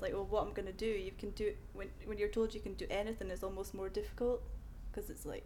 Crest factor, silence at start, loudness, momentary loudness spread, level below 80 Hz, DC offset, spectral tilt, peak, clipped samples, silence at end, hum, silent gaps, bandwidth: 18 dB; 0 s; -41 LUFS; 11 LU; -48 dBFS; under 0.1%; -5.5 dB/octave; -24 dBFS; under 0.1%; 0 s; none; none; 19 kHz